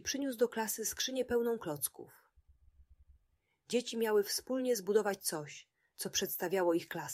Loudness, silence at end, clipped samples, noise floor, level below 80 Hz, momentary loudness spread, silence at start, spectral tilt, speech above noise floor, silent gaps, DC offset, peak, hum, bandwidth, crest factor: -35 LUFS; 0 s; under 0.1%; -78 dBFS; -70 dBFS; 7 LU; 0 s; -3 dB/octave; 43 dB; none; under 0.1%; -18 dBFS; none; 16 kHz; 20 dB